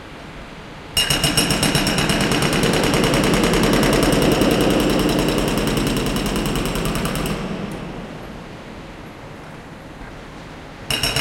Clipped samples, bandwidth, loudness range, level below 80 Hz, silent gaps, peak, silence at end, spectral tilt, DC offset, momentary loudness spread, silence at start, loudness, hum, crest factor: under 0.1%; 17 kHz; 14 LU; -32 dBFS; none; -2 dBFS; 0 s; -4 dB/octave; under 0.1%; 20 LU; 0 s; -18 LUFS; none; 18 dB